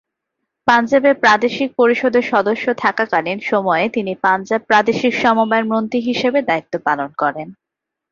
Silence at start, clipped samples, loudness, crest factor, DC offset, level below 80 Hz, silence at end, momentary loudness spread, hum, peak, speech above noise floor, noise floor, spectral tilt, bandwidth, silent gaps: 0.65 s; under 0.1%; -16 LUFS; 16 dB; under 0.1%; -60 dBFS; 0.6 s; 7 LU; none; 0 dBFS; 61 dB; -77 dBFS; -5 dB/octave; 7.4 kHz; none